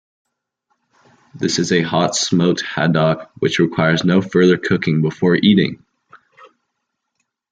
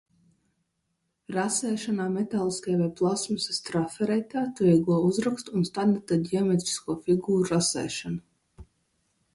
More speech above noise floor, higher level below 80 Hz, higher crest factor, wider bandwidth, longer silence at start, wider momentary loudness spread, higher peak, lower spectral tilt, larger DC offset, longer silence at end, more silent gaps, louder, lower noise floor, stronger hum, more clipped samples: first, 60 dB vs 51 dB; first, -56 dBFS vs -62 dBFS; about the same, 18 dB vs 18 dB; second, 9.4 kHz vs 11.5 kHz; about the same, 1.35 s vs 1.3 s; about the same, 6 LU vs 7 LU; first, 0 dBFS vs -10 dBFS; about the same, -5 dB/octave vs -5 dB/octave; neither; first, 1.35 s vs 0.7 s; neither; first, -16 LUFS vs -27 LUFS; about the same, -75 dBFS vs -77 dBFS; neither; neither